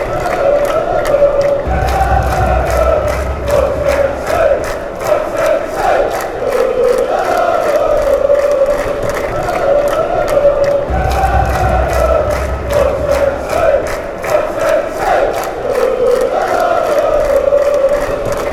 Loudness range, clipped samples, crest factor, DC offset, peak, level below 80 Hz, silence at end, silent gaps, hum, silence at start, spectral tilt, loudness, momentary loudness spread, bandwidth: 1 LU; under 0.1%; 12 dB; under 0.1%; 0 dBFS; -24 dBFS; 0 s; none; none; 0 s; -5.5 dB/octave; -13 LUFS; 5 LU; 16 kHz